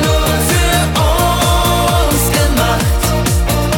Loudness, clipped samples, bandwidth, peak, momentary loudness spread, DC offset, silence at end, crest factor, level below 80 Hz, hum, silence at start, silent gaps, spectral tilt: -13 LUFS; under 0.1%; 19 kHz; -2 dBFS; 2 LU; under 0.1%; 0 s; 10 dB; -18 dBFS; none; 0 s; none; -4 dB/octave